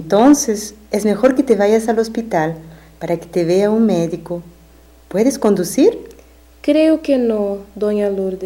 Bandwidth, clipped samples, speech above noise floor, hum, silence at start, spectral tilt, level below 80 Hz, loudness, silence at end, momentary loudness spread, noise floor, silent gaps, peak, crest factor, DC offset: 16.5 kHz; under 0.1%; 30 dB; none; 0 s; -5.5 dB/octave; -46 dBFS; -16 LUFS; 0 s; 10 LU; -45 dBFS; none; -2 dBFS; 14 dB; under 0.1%